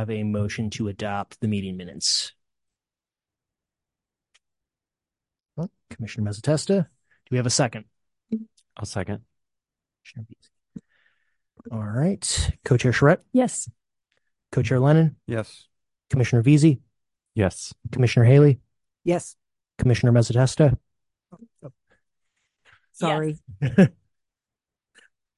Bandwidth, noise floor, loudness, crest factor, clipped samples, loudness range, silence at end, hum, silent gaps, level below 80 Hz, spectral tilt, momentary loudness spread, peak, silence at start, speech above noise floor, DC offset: 11.5 kHz; under -90 dBFS; -22 LUFS; 20 dB; under 0.1%; 16 LU; 1.45 s; none; none; -46 dBFS; -6 dB/octave; 17 LU; -4 dBFS; 0 s; over 69 dB; under 0.1%